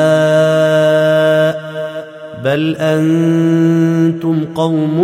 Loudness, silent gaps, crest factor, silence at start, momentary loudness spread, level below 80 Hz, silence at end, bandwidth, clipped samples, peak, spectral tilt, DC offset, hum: -13 LUFS; none; 10 dB; 0 s; 11 LU; -58 dBFS; 0 s; 14.5 kHz; under 0.1%; -2 dBFS; -7 dB/octave; under 0.1%; none